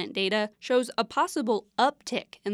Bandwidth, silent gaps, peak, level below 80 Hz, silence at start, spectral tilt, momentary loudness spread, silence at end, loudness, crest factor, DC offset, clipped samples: 14 kHz; none; -10 dBFS; -74 dBFS; 0 s; -3.5 dB/octave; 7 LU; 0 s; -27 LUFS; 18 dB; under 0.1%; under 0.1%